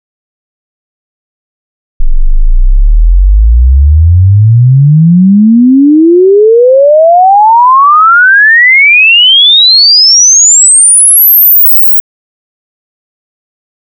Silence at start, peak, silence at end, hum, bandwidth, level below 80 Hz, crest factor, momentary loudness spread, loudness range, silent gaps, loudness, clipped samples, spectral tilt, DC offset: 2 s; 0 dBFS; 2 s; none; 11.5 kHz; -12 dBFS; 4 dB; 10 LU; 10 LU; none; -2 LUFS; 0.4%; -3 dB/octave; under 0.1%